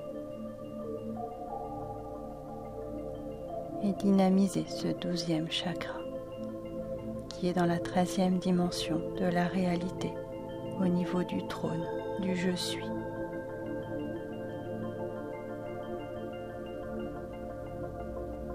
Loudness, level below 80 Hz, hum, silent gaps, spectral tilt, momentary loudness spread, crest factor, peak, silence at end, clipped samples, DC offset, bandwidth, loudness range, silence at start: -34 LUFS; -54 dBFS; none; none; -6 dB/octave; 12 LU; 18 dB; -16 dBFS; 0 s; under 0.1%; under 0.1%; 14.5 kHz; 9 LU; 0 s